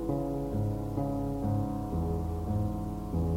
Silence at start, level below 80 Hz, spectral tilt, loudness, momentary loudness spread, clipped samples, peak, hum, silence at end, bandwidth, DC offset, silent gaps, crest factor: 0 s; -40 dBFS; -9.5 dB/octave; -33 LUFS; 2 LU; under 0.1%; -20 dBFS; none; 0 s; 16 kHz; 0.1%; none; 12 dB